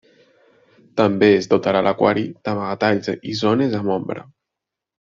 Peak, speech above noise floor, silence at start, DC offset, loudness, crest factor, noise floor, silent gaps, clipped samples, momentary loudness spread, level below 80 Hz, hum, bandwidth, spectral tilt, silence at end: -2 dBFS; 66 dB; 0.95 s; under 0.1%; -19 LUFS; 18 dB; -84 dBFS; none; under 0.1%; 10 LU; -60 dBFS; none; 7.4 kHz; -5 dB/octave; 0.85 s